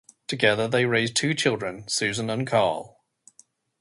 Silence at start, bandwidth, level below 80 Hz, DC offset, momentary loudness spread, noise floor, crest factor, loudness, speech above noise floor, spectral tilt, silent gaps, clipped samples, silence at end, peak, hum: 0.3 s; 11.5 kHz; -62 dBFS; under 0.1%; 7 LU; -59 dBFS; 20 dB; -24 LUFS; 35 dB; -3.5 dB/octave; none; under 0.1%; 0.95 s; -6 dBFS; none